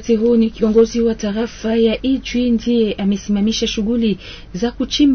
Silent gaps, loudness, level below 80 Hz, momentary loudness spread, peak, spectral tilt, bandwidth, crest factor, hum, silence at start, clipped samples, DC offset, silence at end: none; -17 LUFS; -36 dBFS; 8 LU; -2 dBFS; -5.5 dB/octave; 6.6 kHz; 14 dB; none; 0 s; under 0.1%; under 0.1%; 0 s